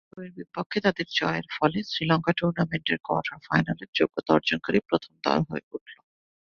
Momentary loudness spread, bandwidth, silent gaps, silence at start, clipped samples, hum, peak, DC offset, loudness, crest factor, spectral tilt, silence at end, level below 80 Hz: 12 LU; 7 kHz; 0.66-0.70 s, 3.88-3.93 s, 5.63-5.71 s, 5.81-5.86 s; 0.15 s; under 0.1%; none; -6 dBFS; under 0.1%; -26 LUFS; 22 dB; -6.5 dB/octave; 0.55 s; -60 dBFS